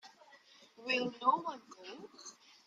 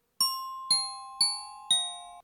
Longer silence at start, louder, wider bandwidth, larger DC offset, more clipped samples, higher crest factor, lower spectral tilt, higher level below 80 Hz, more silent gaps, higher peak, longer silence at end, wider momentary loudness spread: second, 0.05 s vs 0.2 s; second, -35 LUFS vs -28 LUFS; second, 9.2 kHz vs over 20 kHz; neither; neither; first, 24 dB vs 18 dB; first, -3 dB/octave vs 2.5 dB/octave; second, -86 dBFS vs -74 dBFS; neither; about the same, -16 dBFS vs -14 dBFS; first, 0.35 s vs 0 s; first, 20 LU vs 10 LU